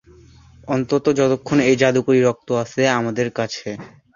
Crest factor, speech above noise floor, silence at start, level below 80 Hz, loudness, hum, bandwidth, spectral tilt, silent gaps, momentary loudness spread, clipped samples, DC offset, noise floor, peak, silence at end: 18 dB; 29 dB; 0.65 s; -54 dBFS; -19 LUFS; none; 7.4 kHz; -5.5 dB/octave; none; 10 LU; under 0.1%; under 0.1%; -47 dBFS; -2 dBFS; 0.3 s